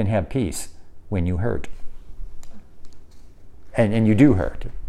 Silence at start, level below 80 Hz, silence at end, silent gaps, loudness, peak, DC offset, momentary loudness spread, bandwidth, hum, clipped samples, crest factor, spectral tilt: 0 s; -36 dBFS; 0 s; none; -21 LUFS; -2 dBFS; under 0.1%; 16 LU; 13.5 kHz; none; under 0.1%; 20 dB; -7.5 dB/octave